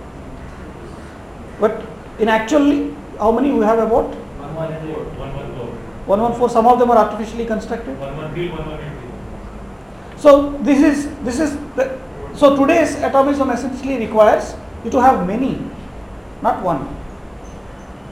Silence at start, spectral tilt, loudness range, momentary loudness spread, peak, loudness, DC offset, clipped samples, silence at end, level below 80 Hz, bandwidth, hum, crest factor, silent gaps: 0 s; -6 dB/octave; 5 LU; 22 LU; 0 dBFS; -17 LUFS; under 0.1%; under 0.1%; 0 s; -38 dBFS; 16 kHz; none; 18 dB; none